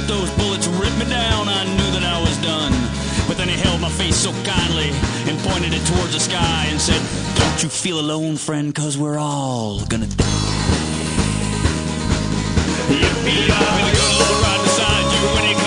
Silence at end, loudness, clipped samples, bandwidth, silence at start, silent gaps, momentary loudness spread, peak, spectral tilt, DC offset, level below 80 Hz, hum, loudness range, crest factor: 0 s; -18 LUFS; under 0.1%; 10.5 kHz; 0 s; none; 6 LU; -2 dBFS; -4 dB/octave; under 0.1%; -30 dBFS; none; 4 LU; 18 dB